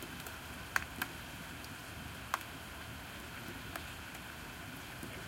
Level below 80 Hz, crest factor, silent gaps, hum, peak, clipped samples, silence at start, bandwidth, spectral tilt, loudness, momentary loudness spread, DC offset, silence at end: -58 dBFS; 34 dB; none; none; -10 dBFS; under 0.1%; 0 s; 17 kHz; -3 dB/octave; -44 LUFS; 8 LU; under 0.1%; 0 s